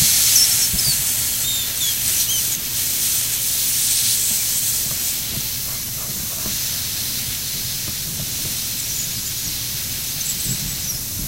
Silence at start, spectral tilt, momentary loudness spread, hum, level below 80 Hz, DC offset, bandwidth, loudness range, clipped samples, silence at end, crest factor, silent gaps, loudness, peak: 0 s; 0 dB/octave; 7 LU; none; -42 dBFS; 0.3%; 16 kHz; 5 LU; under 0.1%; 0 s; 20 dB; none; -18 LUFS; 0 dBFS